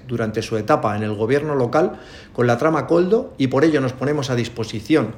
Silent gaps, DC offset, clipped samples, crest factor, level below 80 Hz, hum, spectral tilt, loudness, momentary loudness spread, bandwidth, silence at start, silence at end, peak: none; under 0.1%; under 0.1%; 16 dB; -52 dBFS; none; -6.5 dB/octave; -20 LUFS; 7 LU; 16 kHz; 0.05 s; 0 s; -2 dBFS